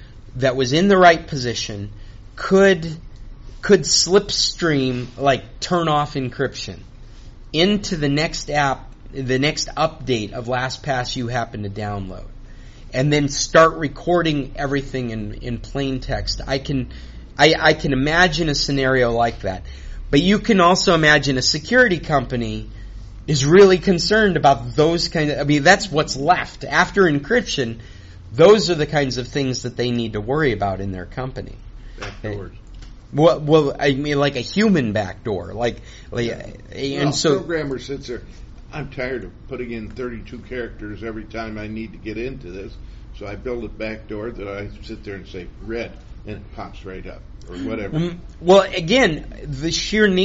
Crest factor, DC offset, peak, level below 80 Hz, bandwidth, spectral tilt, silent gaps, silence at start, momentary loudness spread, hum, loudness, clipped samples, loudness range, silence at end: 20 dB; under 0.1%; 0 dBFS; -36 dBFS; 8 kHz; -3.5 dB/octave; none; 0 s; 19 LU; none; -18 LUFS; under 0.1%; 14 LU; 0 s